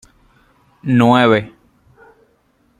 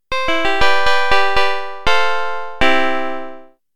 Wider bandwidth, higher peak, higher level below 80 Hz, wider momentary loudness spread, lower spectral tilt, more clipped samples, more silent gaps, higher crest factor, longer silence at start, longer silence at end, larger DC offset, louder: second, 10 kHz vs 16.5 kHz; about the same, -2 dBFS vs 0 dBFS; second, -56 dBFS vs -36 dBFS; first, 19 LU vs 10 LU; first, -7 dB/octave vs -3 dB/octave; neither; neither; about the same, 16 dB vs 18 dB; first, 0.85 s vs 0 s; first, 1.3 s vs 0 s; second, under 0.1% vs 10%; first, -13 LUFS vs -17 LUFS